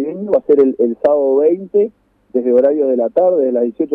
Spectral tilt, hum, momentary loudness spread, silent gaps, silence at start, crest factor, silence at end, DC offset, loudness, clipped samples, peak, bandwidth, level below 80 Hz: -10 dB/octave; none; 5 LU; none; 0 s; 12 dB; 0 s; under 0.1%; -14 LUFS; under 0.1%; -2 dBFS; 3.7 kHz; -60 dBFS